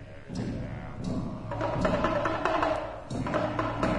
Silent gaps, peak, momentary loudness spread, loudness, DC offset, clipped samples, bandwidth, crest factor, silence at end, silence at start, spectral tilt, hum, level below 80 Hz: none; -10 dBFS; 9 LU; -31 LUFS; under 0.1%; under 0.1%; 10.5 kHz; 20 dB; 0 s; 0 s; -6.5 dB/octave; none; -44 dBFS